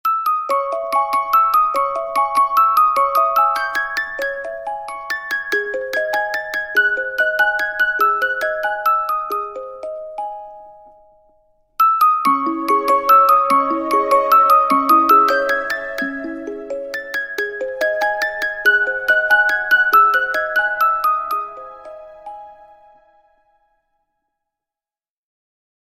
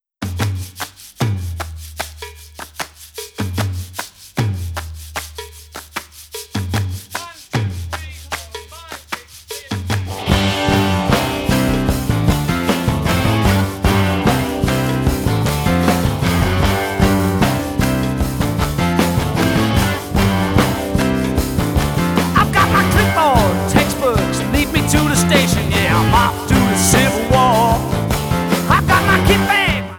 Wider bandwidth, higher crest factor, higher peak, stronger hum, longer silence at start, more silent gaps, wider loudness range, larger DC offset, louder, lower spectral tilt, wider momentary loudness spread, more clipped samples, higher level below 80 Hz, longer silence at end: second, 16.5 kHz vs over 20 kHz; about the same, 16 dB vs 16 dB; about the same, -2 dBFS vs 0 dBFS; neither; second, 0.05 s vs 0.2 s; neither; second, 8 LU vs 11 LU; neither; about the same, -16 LUFS vs -16 LUFS; second, -2 dB/octave vs -5 dB/octave; about the same, 16 LU vs 16 LU; neither; second, -56 dBFS vs -28 dBFS; first, 3.45 s vs 0 s